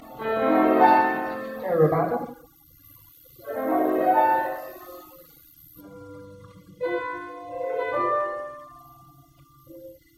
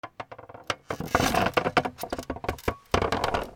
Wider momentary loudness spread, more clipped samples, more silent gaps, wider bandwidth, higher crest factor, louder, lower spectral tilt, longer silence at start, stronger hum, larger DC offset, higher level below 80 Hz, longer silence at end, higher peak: first, 25 LU vs 16 LU; neither; neither; second, 16 kHz vs over 20 kHz; about the same, 22 dB vs 22 dB; first, -24 LUFS vs -28 LUFS; first, -7.5 dB/octave vs -4.5 dB/octave; about the same, 0 s vs 0.05 s; neither; neither; second, -64 dBFS vs -44 dBFS; first, 0.25 s vs 0 s; first, -2 dBFS vs -6 dBFS